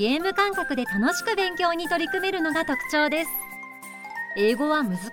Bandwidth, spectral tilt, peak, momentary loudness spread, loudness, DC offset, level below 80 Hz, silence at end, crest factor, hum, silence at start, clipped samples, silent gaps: 17 kHz; -4 dB/octave; -8 dBFS; 12 LU; -24 LUFS; under 0.1%; -56 dBFS; 0 s; 16 dB; none; 0 s; under 0.1%; none